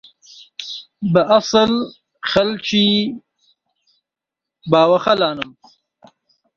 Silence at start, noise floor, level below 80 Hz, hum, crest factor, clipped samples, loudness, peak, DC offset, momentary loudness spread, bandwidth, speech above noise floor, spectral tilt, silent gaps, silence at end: 0.4 s; -85 dBFS; -54 dBFS; none; 18 dB; under 0.1%; -16 LUFS; 0 dBFS; under 0.1%; 17 LU; 7.4 kHz; 69 dB; -5 dB/octave; none; 1.1 s